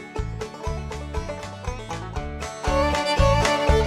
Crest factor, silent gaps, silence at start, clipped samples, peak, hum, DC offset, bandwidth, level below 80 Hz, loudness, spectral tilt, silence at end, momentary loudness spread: 18 dB; none; 0 s; under 0.1%; -6 dBFS; none; under 0.1%; 14.5 kHz; -30 dBFS; -25 LUFS; -5 dB/octave; 0 s; 13 LU